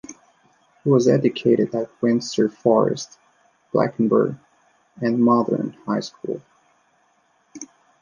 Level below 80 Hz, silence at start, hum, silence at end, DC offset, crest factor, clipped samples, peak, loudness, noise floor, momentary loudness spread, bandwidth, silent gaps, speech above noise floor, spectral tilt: -66 dBFS; 0.1 s; none; 0.35 s; under 0.1%; 18 dB; under 0.1%; -4 dBFS; -21 LUFS; -63 dBFS; 20 LU; 7.4 kHz; none; 43 dB; -6.5 dB/octave